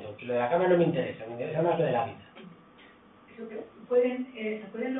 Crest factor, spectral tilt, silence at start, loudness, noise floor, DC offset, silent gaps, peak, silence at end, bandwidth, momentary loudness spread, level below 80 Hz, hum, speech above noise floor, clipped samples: 18 dB; -11 dB/octave; 0 s; -28 LUFS; -55 dBFS; under 0.1%; none; -12 dBFS; 0 s; 3.9 kHz; 19 LU; -70 dBFS; none; 27 dB; under 0.1%